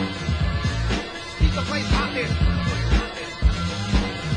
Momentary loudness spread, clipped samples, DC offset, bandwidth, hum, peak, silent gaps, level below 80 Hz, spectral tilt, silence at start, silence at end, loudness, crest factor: 4 LU; under 0.1%; under 0.1%; 10.5 kHz; none; -8 dBFS; none; -26 dBFS; -5.5 dB/octave; 0 s; 0 s; -24 LUFS; 14 dB